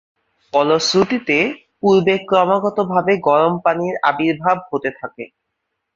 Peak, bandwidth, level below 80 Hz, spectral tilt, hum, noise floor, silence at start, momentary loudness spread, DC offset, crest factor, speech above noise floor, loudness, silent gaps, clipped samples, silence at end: -2 dBFS; 7.8 kHz; -58 dBFS; -5 dB/octave; none; -75 dBFS; 0.55 s; 9 LU; under 0.1%; 16 dB; 59 dB; -17 LUFS; none; under 0.1%; 0.7 s